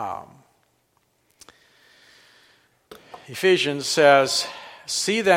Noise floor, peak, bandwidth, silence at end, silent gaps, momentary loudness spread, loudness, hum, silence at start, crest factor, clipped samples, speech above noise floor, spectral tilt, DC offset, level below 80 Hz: -67 dBFS; -2 dBFS; 16.5 kHz; 0 s; none; 22 LU; -20 LUFS; none; 0 s; 22 dB; under 0.1%; 47 dB; -3 dB/octave; under 0.1%; -70 dBFS